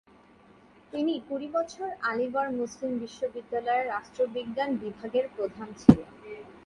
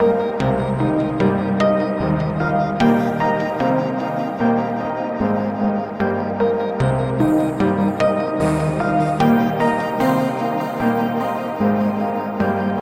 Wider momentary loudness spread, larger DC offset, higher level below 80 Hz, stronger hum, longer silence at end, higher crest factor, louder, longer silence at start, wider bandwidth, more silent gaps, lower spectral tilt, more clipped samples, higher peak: first, 13 LU vs 5 LU; neither; second, -54 dBFS vs -44 dBFS; neither; about the same, 0.05 s vs 0 s; first, 28 dB vs 14 dB; second, -29 LUFS vs -19 LUFS; first, 0.95 s vs 0 s; second, 10.5 kHz vs 16 kHz; neither; about the same, -7 dB/octave vs -8 dB/octave; neither; first, 0 dBFS vs -4 dBFS